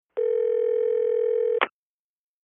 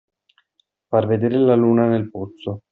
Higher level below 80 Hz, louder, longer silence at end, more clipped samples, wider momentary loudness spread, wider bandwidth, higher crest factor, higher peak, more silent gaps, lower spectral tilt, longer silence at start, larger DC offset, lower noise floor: second, -78 dBFS vs -62 dBFS; second, -24 LUFS vs -18 LUFS; first, 0.8 s vs 0.15 s; neither; second, 3 LU vs 15 LU; second, 3.7 kHz vs 4.1 kHz; about the same, 20 dB vs 16 dB; about the same, -4 dBFS vs -4 dBFS; neither; second, 1.5 dB/octave vs -8 dB/octave; second, 0.15 s vs 0.9 s; neither; first, under -90 dBFS vs -68 dBFS